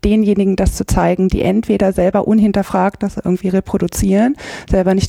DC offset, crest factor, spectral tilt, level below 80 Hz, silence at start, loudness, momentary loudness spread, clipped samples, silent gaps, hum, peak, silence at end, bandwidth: under 0.1%; 12 dB; -6.5 dB/octave; -26 dBFS; 0.05 s; -15 LUFS; 5 LU; under 0.1%; none; none; -2 dBFS; 0 s; 15.5 kHz